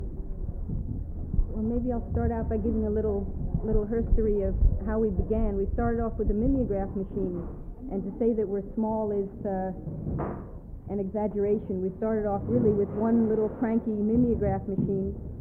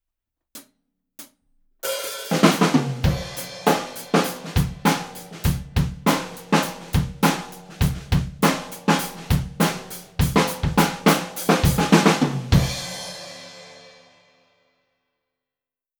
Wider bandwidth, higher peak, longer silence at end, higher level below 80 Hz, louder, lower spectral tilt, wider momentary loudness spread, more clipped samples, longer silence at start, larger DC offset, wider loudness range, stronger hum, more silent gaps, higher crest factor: second, 2.8 kHz vs over 20 kHz; second, -10 dBFS vs -2 dBFS; second, 0 s vs 2.2 s; about the same, -34 dBFS vs -34 dBFS; second, -29 LUFS vs -22 LUFS; first, -13 dB/octave vs -5 dB/octave; second, 10 LU vs 13 LU; neither; second, 0 s vs 0.55 s; neither; about the same, 5 LU vs 4 LU; neither; neither; second, 16 dB vs 22 dB